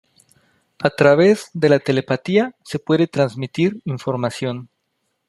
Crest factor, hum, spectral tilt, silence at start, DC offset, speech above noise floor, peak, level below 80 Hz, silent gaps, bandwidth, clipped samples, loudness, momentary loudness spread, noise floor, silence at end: 18 dB; none; -6.5 dB/octave; 0.8 s; under 0.1%; 54 dB; -2 dBFS; -62 dBFS; none; 12.5 kHz; under 0.1%; -18 LUFS; 12 LU; -72 dBFS; 0.65 s